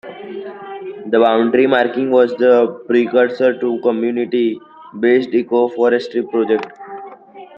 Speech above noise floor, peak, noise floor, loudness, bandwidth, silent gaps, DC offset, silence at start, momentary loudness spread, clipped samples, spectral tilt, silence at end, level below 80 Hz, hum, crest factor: 23 dB; -2 dBFS; -38 dBFS; -15 LUFS; 6 kHz; none; under 0.1%; 0.05 s; 17 LU; under 0.1%; -7 dB/octave; 0.1 s; -64 dBFS; none; 14 dB